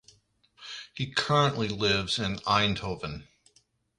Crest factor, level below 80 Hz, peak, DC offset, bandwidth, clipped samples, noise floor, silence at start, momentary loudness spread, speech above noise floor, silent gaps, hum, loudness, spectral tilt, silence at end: 20 dB; -54 dBFS; -10 dBFS; under 0.1%; 11.5 kHz; under 0.1%; -67 dBFS; 0.6 s; 17 LU; 40 dB; none; none; -27 LUFS; -4.5 dB/octave; 0.75 s